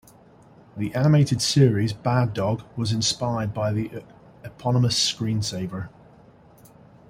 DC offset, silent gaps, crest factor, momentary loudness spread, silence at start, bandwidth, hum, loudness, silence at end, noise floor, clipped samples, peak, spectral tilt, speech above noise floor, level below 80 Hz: under 0.1%; none; 20 dB; 16 LU; 0.75 s; 16 kHz; none; -23 LUFS; 1.2 s; -51 dBFS; under 0.1%; -4 dBFS; -5 dB/octave; 29 dB; -54 dBFS